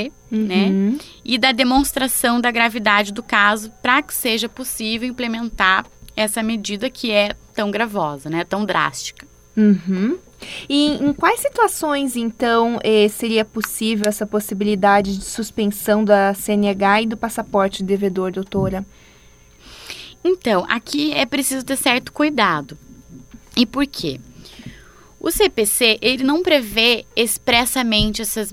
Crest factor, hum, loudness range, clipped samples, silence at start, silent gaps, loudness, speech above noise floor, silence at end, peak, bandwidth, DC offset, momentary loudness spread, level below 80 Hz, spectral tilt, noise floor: 18 dB; none; 5 LU; under 0.1%; 0 s; none; -18 LUFS; 29 dB; 0 s; 0 dBFS; 16.5 kHz; under 0.1%; 9 LU; -44 dBFS; -3.5 dB/octave; -48 dBFS